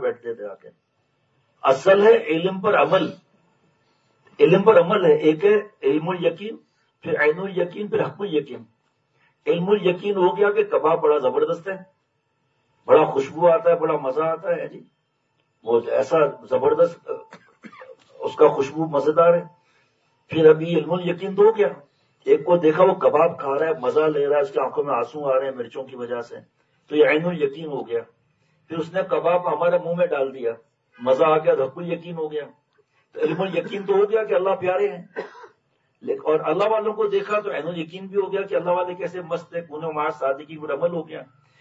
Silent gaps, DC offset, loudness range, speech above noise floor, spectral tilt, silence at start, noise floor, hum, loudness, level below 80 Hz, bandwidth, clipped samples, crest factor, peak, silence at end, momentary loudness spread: none; under 0.1%; 5 LU; 50 dB; -7 dB/octave; 0 s; -70 dBFS; none; -21 LUFS; -74 dBFS; 7.8 kHz; under 0.1%; 20 dB; -2 dBFS; 0.35 s; 15 LU